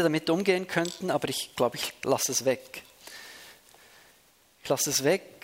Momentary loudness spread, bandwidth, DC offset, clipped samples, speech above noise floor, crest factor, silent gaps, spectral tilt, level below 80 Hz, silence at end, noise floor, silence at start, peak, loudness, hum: 19 LU; 16 kHz; under 0.1%; under 0.1%; 34 dB; 22 dB; none; -3 dB/octave; -70 dBFS; 0.15 s; -62 dBFS; 0 s; -8 dBFS; -27 LUFS; none